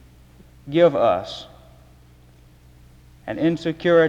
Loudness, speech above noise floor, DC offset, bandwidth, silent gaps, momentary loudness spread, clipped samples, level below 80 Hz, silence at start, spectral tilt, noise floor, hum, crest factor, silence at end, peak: -20 LUFS; 31 dB; under 0.1%; 8 kHz; none; 20 LU; under 0.1%; -52 dBFS; 0.65 s; -7 dB/octave; -50 dBFS; none; 18 dB; 0 s; -4 dBFS